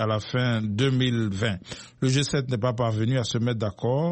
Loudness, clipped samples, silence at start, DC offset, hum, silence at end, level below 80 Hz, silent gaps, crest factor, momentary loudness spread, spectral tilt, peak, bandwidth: -25 LUFS; under 0.1%; 0 s; under 0.1%; none; 0 s; -54 dBFS; none; 14 dB; 5 LU; -6 dB/octave; -10 dBFS; 8.8 kHz